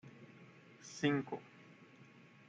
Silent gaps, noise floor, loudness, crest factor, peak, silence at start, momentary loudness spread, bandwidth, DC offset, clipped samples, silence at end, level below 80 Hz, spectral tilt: none; -61 dBFS; -39 LUFS; 22 dB; -22 dBFS; 0.05 s; 24 LU; 8.6 kHz; under 0.1%; under 0.1%; 0.45 s; -82 dBFS; -5.5 dB/octave